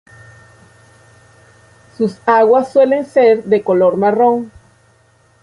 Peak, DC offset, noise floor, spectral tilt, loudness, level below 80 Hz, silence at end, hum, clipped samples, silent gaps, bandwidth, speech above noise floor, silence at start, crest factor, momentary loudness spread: -2 dBFS; under 0.1%; -52 dBFS; -7.5 dB/octave; -13 LUFS; -56 dBFS; 0.95 s; none; under 0.1%; none; 11 kHz; 40 dB; 2 s; 14 dB; 9 LU